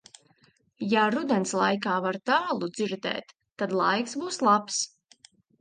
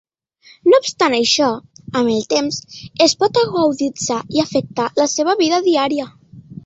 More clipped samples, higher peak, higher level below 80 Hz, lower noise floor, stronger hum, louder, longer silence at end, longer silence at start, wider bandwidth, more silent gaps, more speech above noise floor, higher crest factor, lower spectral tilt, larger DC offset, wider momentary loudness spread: neither; second, -8 dBFS vs -2 dBFS; second, -76 dBFS vs -56 dBFS; first, -64 dBFS vs -50 dBFS; neither; second, -27 LUFS vs -17 LUFS; first, 0.75 s vs 0.1 s; first, 0.8 s vs 0.65 s; first, 10 kHz vs 8.2 kHz; neither; first, 38 dB vs 33 dB; about the same, 20 dB vs 16 dB; about the same, -3.5 dB/octave vs -3.5 dB/octave; neither; about the same, 9 LU vs 10 LU